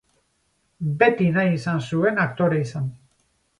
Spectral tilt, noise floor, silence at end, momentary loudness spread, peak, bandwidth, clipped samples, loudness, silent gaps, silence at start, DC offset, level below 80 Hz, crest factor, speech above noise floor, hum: -7.5 dB/octave; -68 dBFS; 0.65 s; 12 LU; -4 dBFS; 10.5 kHz; under 0.1%; -22 LUFS; none; 0.8 s; under 0.1%; -60 dBFS; 20 dB; 47 dB; none